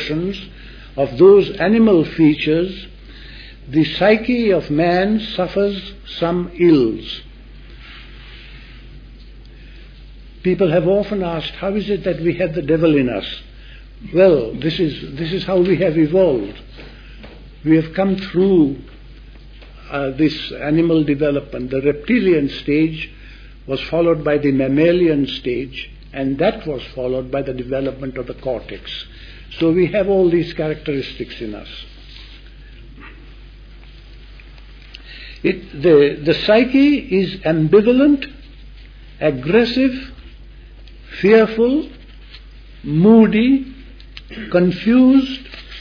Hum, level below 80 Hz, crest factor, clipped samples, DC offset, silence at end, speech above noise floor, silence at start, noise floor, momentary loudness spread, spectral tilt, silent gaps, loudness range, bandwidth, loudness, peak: none; -38 dBFS; 16 dB; under 0.1%; under 0.1%; 0 s; 23 dB; 0 s; -39 dBFS; 20 LU; -8.5 dB/octave; none; 7 LU; 5.4 kHz; -16 LUFS; 0 dBFS